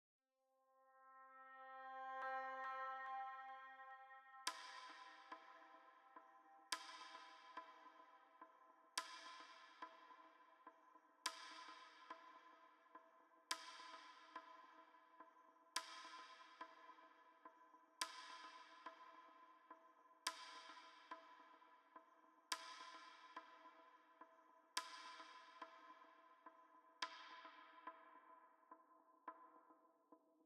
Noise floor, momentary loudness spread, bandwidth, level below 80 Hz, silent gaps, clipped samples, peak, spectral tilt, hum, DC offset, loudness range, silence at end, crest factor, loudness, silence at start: -85 dBFS; 17 LU; 12 kHz; under -90 dBFS; none; under 0.1%; -24 dBFS; 2.5 dB/octave; none; under 0.1%; 6 LU; 0 s; 34 dB; -55 LUFS; 0.6 s